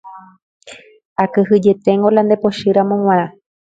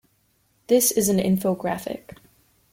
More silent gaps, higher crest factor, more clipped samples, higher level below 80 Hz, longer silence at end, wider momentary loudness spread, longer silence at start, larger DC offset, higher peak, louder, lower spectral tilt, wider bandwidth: first, 0.43-0.60 s, 1.05-1.16 s vs none; about the same, 16 dB vs 18 dB; neither; about the same, -58 dBFS vs -58 dBFS; second, 0.45 s vs 0.75 s; second, 6 LU vs 14 LU; second, 0.05 s vs 0.7 s; neither; first, 0 dBFS vs -8 dBFS; first, -14 LUFS vs -21 LUFS; first, -7.5 dB/octave vs -4.5 dB/octave; second, 7.8 kHz vs 16.5 kHz